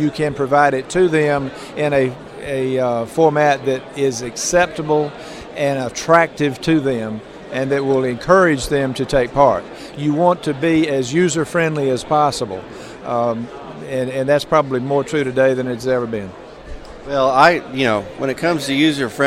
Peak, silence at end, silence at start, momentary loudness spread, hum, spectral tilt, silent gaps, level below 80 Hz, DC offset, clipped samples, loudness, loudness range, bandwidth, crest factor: 0 dBFS; 0 s; 0 s; 13 LU; none; -5 dB/octave; none; -44 dBFS; under 0.1%; under 0.1%; -17 LUFS; 3 LU; 15 kHz; 18 dB